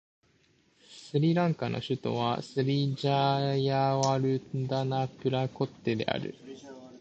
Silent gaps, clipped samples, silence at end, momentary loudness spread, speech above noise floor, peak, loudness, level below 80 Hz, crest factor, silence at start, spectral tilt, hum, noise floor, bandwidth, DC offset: none; under 0.1%; 0.05 s; 9 LU; 38 dB; -10 dBFS; -29 LUFS; -66 dBFS; 20 dB; 0.9 s; -6.5 dB/octave; none; -67 dBFS; 8.2 kHz; under 0.1%